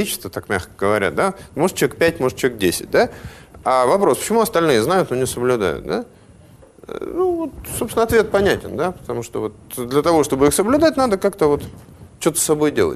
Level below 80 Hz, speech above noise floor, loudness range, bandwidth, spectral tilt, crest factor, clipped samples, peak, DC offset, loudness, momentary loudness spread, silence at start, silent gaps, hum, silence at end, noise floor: -44 dBFS; 28 dB; 3 LU; 13.5 kHz; -4.5 dB/octave; 16 dB; under 0.1%; -4 dBFS; under 0.1%; -18 LUFS; 11 LU; 0 s; none; none; 0 s; -46 dBFS